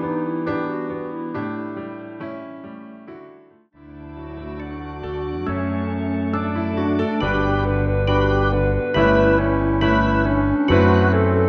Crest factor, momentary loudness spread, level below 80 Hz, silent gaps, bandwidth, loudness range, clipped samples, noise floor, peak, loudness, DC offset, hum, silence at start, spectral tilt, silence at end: 16 dB; 19 LU; -34 dBFS; none; 6.2 kHz; 16 LU; under 0.1%; -49 dBFS; -4 dBFS; -20 LUFS; under 0.1%; none; 0 s; -8.5 dB/octave; 0 s